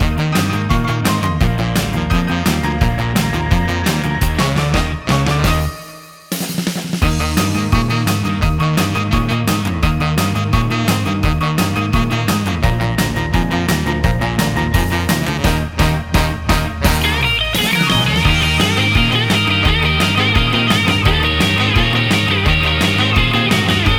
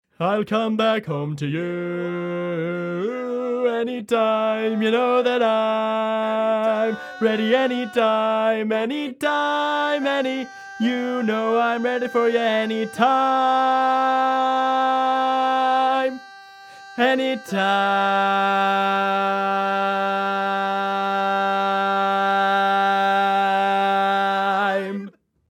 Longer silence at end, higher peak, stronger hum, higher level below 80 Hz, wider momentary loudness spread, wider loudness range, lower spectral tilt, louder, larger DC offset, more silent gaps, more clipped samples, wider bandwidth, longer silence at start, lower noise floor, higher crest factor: second, 0 s vs 0.4 s; first, 0 dBFS vs -6 dBFS; neither; first, -22 dBFS vs -76 dBFS; second, 4 LU vs 7 LU; about the same, 4 LU vs 3 LU; about the same, -5 dB/octave vs -5.5 dB/octave; first, -15 LUFS vs -21 LUFS; neither; neither; neither; first, over 20 kHz vs 15 kHz; second, 0 s vs 0.2 s; second, -36 dBFS vs -43 dBFS; about the same, 14 dB vs 16 dB